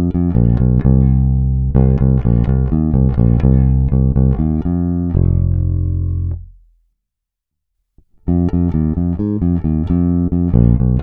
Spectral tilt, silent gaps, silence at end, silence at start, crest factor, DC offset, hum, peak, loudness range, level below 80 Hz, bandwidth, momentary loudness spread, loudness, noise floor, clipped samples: -13.5 dB/octave; none; 0 s; 0 s; 14 dB; under 0.1%; none; 0 dBFS; 7 LU; -20 dBFS; 2.6 kHz; 5 LU; -15 LUFS; -79 dBFS; under 0.1%